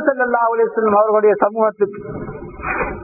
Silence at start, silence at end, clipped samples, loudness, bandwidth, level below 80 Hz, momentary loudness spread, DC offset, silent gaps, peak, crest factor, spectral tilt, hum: 0 s; 0 s; under 0.1%; -16 LUFS; 2.7 kHz; -42 dBFS; 15 LU; under 0.1%; none; 0 dBFS; 16 dB; -15 dB/octave; none